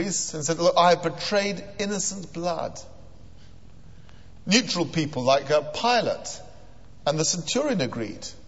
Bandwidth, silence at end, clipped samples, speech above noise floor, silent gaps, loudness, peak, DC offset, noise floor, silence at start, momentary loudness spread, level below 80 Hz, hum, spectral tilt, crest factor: 8.2 kHz; 0.05 s; under 0.1%; 25 dB; none; -24 LUFS; -6 dBFS; 0.7%; -49 dBFS; 0 s; 12 LU; -54 dBFS; none; -3.5 dB/octave; 20 dB